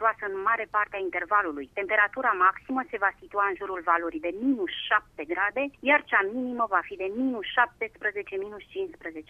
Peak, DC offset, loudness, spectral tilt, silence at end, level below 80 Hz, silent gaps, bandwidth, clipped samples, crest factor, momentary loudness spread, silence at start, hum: -6 dBFS; under 0.1%; -27 LUFS; -5.5 dB/octave; 0.05 s; -62 dBFS; none; 5.6 kHz; under 0.1%; 20 dB; 11 LU; 0 s; none